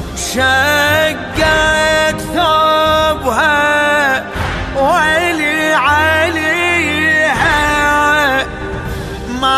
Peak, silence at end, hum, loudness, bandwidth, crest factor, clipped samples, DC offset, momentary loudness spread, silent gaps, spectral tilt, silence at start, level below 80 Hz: 0 dBFS; 0 s; none; -12 LUFS; 14 kHz; 12 dB; under 0.1%; under 0.1%; 8 LU; none; -3.5 dB/octave; 0 s; -30 dBFS